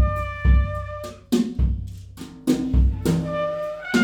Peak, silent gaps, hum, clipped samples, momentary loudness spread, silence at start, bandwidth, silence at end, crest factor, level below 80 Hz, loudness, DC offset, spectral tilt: -6 dBFS; none; none; under 0.1%; 14 LU; 0 s; 15.5 kHz; 0 s; 16 dB; -24 dBFS; -23 LUFS; under 0.1%; -7 dB/octave